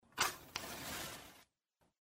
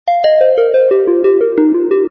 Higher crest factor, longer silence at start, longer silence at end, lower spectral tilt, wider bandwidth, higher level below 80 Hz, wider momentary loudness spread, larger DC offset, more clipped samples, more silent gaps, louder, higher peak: first, 28 dB vs 10 dB; about the same, 0.1 s vs 0.05 s; first, 0.7 s vs 0 s; second, -1 dB/octave vs -7 dB/octave; first, 16 kHz vs 5.8 kHz; second, -70 dBFS vs -60 dBFS; first, 14 LU vs 2 LU; neither; neither; neither; second, -42 LUFS vs -11 LUFS; second, -18 dBFS vs 0 dBFS